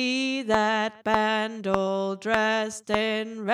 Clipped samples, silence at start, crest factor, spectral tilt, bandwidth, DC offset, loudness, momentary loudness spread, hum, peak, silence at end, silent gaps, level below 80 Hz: under 0.1%; 0 s; 22 dB; -4 dB/octave; 13 kHz; under 0.1%; -25 LUFS; 4 LU; none; -4 dBFS; 0 s; none; -58 dBFS